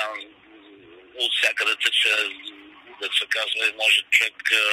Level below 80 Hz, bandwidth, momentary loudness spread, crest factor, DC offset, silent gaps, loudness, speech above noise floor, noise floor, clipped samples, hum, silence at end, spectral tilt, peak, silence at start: -74 dBFS; 16 kHz; 14 LU; 20 dB; under 0.1%; none; -20 LUFS; 27 dB; -49 dBFS; under 0.1%; none; 0 s; 2 dB/octave; -4 dBFS; 0 s